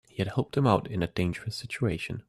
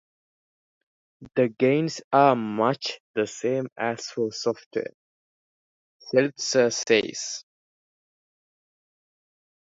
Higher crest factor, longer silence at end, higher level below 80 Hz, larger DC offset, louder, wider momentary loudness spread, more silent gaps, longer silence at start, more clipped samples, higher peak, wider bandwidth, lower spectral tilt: about the same, 22 dB vs 22 dB; second, 0.05 s vs 2.3 s; first, -54 dBFS vs -72 dBFS; neither; second, -29 LUFS vs -25 LUFS; second, 7 LU vs 11 LU; second, none vs 2.04-2.11 s, 3.00-3.14 s, 3.72-3.76 s, 4.66-4.71 s, 4.94-6.00 s; second, 0.15 s vs 1.2 s; neither; about the same, -8 dBFS vs -6 dBFS; first, 13 kHz vs 8 kHz; first, -7 dB/octave vs -4 dB/octave